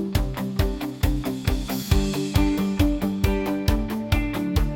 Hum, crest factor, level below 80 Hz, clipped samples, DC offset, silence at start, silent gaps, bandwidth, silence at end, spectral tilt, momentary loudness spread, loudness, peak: none; 18 dB; -28 dBFS; under 0.1%; under 0.1%; 0 s; none; 17 kHz; 0 s; -6 dB/octave; 4 LU; -24 LUFS; -4 dBFS